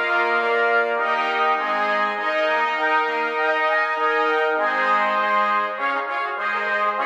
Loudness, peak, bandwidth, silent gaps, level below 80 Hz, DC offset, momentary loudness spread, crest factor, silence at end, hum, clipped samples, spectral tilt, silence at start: -20 LUFS; -8 dBFS; 9.6 kHz; none; -80 dBFS; under 0.1%; 4 LU; 12 dB; 0 s; none; under 0.1%; -3 dB/octave; 0 s